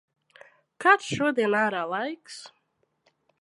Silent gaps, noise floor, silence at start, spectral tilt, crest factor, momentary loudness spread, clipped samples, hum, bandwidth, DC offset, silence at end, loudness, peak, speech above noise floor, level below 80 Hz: none; -73 dBFS; 0.8 s; -4.5 dB/octave; 24 dB; 19 LU; under 0.1%; none; 11.5 kHz; under 0.1%; 0.95 s; -24 LUFS; -4 dBFS; 48 dB; -70 dBFS